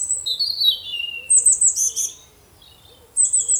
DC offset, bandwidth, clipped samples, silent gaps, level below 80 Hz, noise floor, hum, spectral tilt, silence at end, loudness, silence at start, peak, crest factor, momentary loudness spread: under 0.1%; over 20 kHz; under 0.1%; none; -60 dBFS; -49 dBFS; none; 4 dB/octave; 0 s; -17 LUFS; 0 s; -4 dBFS; 16 dB; 13 LU